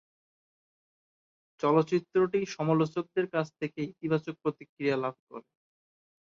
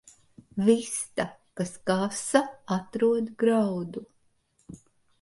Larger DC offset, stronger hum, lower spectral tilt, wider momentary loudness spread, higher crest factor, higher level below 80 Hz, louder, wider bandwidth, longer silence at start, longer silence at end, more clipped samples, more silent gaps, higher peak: neither; neither; first, -7 dB/octave vs -5 dB/octave; about the same, 10 LU vs 11 LU; about the same, 18 dB vs 22 dB; second, -74 dBFS vs -66 dBFS; second, -30 LUFS vs -27 LUFS; second, 7.4 kHz vs 11.5 kHz; first, 1.65 s vs 0.55 s; first, 0.9 s vs 0.45 s; neither; first, 4.69-4.77 s, 5.19-5.27 s vs none; second, -12 dBFS vs -6 dBFS